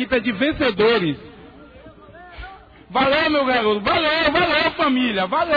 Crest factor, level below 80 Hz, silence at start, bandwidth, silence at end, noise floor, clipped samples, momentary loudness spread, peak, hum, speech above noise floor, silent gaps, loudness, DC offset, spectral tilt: 16 dB; -46 dBFS; 0 s; 5 kHz; 0 s; -43 dBFS; under 0.1%; 16 LU; -4 dBFS; none; 25 dB; none; -18 LUFS; under 0.1%; -6.5 dB/octave